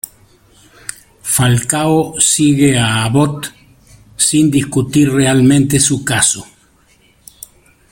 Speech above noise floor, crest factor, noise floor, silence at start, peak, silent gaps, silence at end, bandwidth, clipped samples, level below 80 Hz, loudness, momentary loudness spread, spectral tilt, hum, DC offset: 39 dB; 14 dB; -51 dBFS; 1.25 s; 0 dBFS; none; 1.5 s; 17 kHz; under 0.1%; -44 dBFS; -12 LUFS; 17 LU; -4 dB/octave; none; under 0.1%